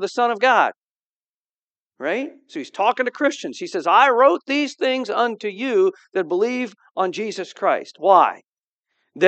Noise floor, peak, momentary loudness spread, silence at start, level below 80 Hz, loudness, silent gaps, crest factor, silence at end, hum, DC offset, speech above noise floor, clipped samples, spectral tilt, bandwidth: under -90 dBFS; 0 dBFS; 13 LU; 0 s; -88 dBFS; -20 LUFS; 0.76-1.45 s, 1.51-1.71 s, 1.79-1.86 s, 8.48-8.52 s, 8.64-8.83 s; 20 dB; 0 s; none; under 0.1%; over 70 dB; under 0.1%; -4 dB/octave; 8.8 kHz